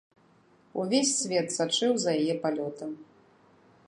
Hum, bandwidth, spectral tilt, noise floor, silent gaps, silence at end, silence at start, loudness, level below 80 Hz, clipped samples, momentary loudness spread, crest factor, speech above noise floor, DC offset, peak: none; 11.5 kHz; -3 dB/octave; -62 dBFS; none; 0.85 s; 0.75 s; -28 LUFS; -78 dBFS; under 0.1%; 14 LU; 18 dB; 34 dB; under 0.1%; -12 dBFS